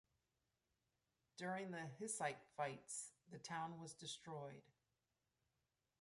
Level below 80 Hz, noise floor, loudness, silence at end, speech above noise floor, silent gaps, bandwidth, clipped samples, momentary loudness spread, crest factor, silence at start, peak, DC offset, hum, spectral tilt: -90 dBFS; under -90 dBFS; -50 LUFS; 1.4 s; over 40 dB; none; 11.5 kHz; under 0.1%; 11 LU; 22 dB; 1.35 s; -30 dBFS; under 0.1%; none; -3.5 dB/octave